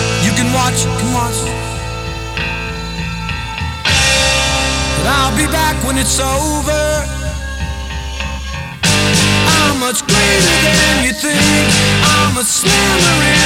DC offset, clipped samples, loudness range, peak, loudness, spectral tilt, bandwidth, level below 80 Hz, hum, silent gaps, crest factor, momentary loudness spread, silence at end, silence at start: under 0.1%; under 0.1%; 6 LU; 0 dBFS; -13 LUFS; -3 dB/octave; 18 kHz; -24 dBFS; none; none; 14 dB; 12 LU; 0 s; 0 s